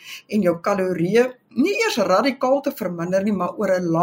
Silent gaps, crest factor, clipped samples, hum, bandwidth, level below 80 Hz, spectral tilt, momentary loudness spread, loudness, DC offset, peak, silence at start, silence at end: none; 14 dB; under 0.1%; none; 16 kHz; -64 dBFS; -5.5 dB/octave; 5 LU; -21 LUFS; under 0.1%; -6 dBFS; 0.05 s; 0 s